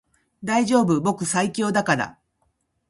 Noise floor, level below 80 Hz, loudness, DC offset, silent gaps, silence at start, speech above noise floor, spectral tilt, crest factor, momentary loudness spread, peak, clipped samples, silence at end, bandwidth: -70 dBFS; -60 dBFS; -22 LUFS; under 0.1%; none; 0.4 s; 49 dB; -5 dB/octave; 20 dB; 6 LU; -4 dBFS; under 0.1%; 0.8 s; 11.5 kHz